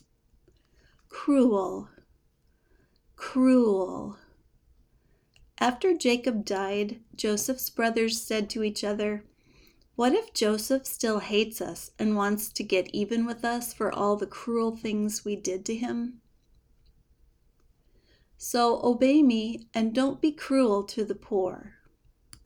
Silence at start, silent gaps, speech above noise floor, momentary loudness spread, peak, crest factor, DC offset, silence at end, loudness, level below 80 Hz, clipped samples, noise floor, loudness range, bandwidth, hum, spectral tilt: 1.1 s; none; 41 dB; 11 LU; -10 dBFS; 18 dB; under 0.1%; 0.75 s; -27 LUFS; -62 dBFS; under 0.1%; -67 dBFS; 6 LU; over 20 kHz; none; -4 dB/octave